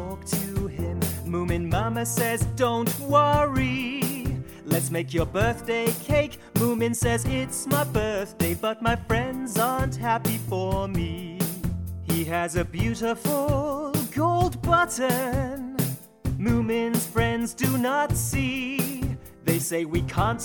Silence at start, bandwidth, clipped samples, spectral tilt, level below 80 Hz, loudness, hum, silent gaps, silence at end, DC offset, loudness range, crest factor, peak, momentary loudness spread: 0 s; 19.5 kHz; under 0.1%; -5 dB/octave; -40 dBFS; -25 LUFS; none; none; 0 s; under 0.1%; 3 LU; 18 dB; -8 dBFS; 6 LU